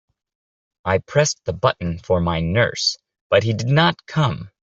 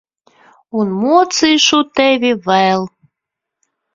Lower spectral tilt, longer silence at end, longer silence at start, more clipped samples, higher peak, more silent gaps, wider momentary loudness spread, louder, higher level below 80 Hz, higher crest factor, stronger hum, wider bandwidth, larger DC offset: about the same, -4.5 dB/octave vs -3.5 dB/octave; second, 0.2 s vs 1.05 s; about the same, 0.85 s vs 0.75 s; neither; about the same, -2 dBFS vs 0 dBFS; first, 3.21-3.30 s vs none; second, 6 LU vs 9 LU; second, -20 LUFS vs -13 LUFS; first, -48 dBFS vs -58 dBFS; about the same, 18 dB vs 16 dB; neither; about the same, 7.8 kHz vs 7.8 kHz; neither